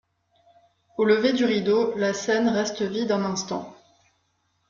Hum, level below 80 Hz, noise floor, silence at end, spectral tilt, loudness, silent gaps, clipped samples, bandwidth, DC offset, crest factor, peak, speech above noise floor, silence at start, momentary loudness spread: none; -66 dBFS; -71 dBFS; 0.95 s; -4.5 dB/octave; -23 LUFS; none; under 0.1%; 7.4 kHz; under 0.1%; 18 dB; -8 dBFS; 48 dB; 1 s; 12 LU